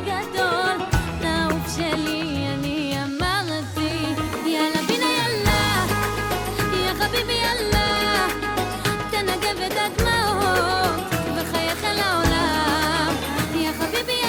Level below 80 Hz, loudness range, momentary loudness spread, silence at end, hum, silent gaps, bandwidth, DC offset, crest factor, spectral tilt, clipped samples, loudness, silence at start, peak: -36 dBFS; 3 LU; 5 LU; 0 s; none; none; over 20 kHz; under 0.1%; 16 dB; -4 dB/octave; under 0.1%; -22 LUFS; 0 s; -6 dBFS